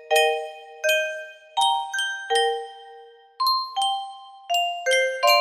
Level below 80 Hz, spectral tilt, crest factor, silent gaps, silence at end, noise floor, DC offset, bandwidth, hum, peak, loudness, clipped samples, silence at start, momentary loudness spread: -76 dBFS; 3 dB/octave; 18 dB; none; 0 s; -47 dBFS; under 0.1%; 15.5 kHz; none; -6 dBFS; -23 LUFS; under 0.1%; 0 s; 16 LU